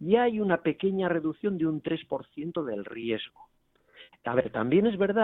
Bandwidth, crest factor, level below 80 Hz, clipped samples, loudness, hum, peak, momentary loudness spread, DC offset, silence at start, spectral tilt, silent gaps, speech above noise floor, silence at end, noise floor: 4.1 kHz; 20 dB; -64 dBFS; under 0.1%; -29 LUFS; none; -8 dBFS; 10 LU; under 0.1%; 0 s; -10 dB/octave; none; 30 dB; 0 s; -57 dBFS